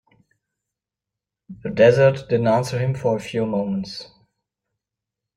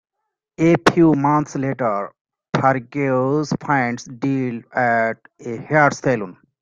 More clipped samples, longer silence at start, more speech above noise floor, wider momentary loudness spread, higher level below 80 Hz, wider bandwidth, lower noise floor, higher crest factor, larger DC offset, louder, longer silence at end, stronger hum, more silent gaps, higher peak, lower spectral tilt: neither; first, 1.5 s vs 0.6 s; first, 68 dB vs 60 dB; first, 16 LU vs 11 LU; about the same, -56 dBFS vs -56 dBFS; first, 12 kHz vs 10.5 kHz; first, -87 dBFS vs -79 dBFS; about the same, 20 dB vs 20 dB; neither; about the same, -20 LUFS vs -19 LUFS; first, 1.35 s vs 0.3 s; neither; second, none vs 2.21-2.25 s; about the same, -2 dBFS vs 0 dBFS; about the same, -7 dB/octave vs -6.5 dB/octave